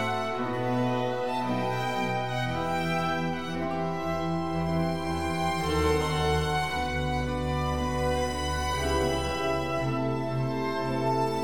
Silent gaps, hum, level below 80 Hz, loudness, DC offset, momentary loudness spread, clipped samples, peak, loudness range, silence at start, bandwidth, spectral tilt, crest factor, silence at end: none; none; -40 dBFS; -29 LUFS; 0.7%; 3 LU; under 0.1%; -14 dBFS; 1 LU; 0 s; 19.5 kHz; -5.5 dB/octave; 14 dB; 0 s